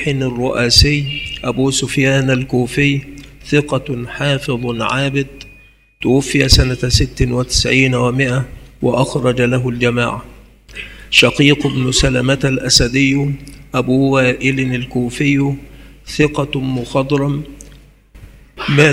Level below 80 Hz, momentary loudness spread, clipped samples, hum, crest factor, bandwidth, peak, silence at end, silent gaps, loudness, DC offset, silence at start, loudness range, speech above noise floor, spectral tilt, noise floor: -30 dBFS; 11 LU; under 0.1%; none; 16 dB; 16 kHz; 0 dBFS; 0 s; none; -15 LUFS; under 0.1%; 0 s; 5 LU; 31 dB; -4.5 dB/octave; -45 dBFS